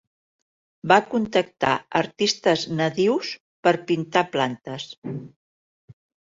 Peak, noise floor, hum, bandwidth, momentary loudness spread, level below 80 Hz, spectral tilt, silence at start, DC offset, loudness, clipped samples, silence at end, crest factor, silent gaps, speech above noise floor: -2 dBFS; under -90 dBFS; none; 7.8 kHz; 14 LU; -62 dBFS; -4.5 dB/octave; 0.85 s; under 0.1%; -22 LUFS; under 0.1%; 0.4 s; 22 dB; 3.40-3.63 s, 4.98-5.02 s, 5.36-5.88 s; over 68 dB